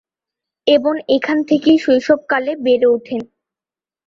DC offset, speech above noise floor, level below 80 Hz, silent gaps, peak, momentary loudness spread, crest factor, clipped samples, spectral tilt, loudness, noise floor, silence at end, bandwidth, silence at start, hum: under 0.1%; over 75 dB; -58 dBFS; none; -2 dBFS; 7 LU; 14 dB; under 0.1%; -5 dB/octave; -15 LUFS; under -90 dBFS; 0.8 s; 7.4 kHz; 0.65 s; none